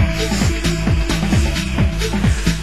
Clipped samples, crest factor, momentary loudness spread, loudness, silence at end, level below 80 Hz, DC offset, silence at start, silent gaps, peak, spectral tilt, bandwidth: under 0.1%; 14 dB; 2 LU; -18 LUFS; 0 s; -20 dBFS; 2%; 0 s; none; -2 dBFS; -5 dB/octave; 16 kHz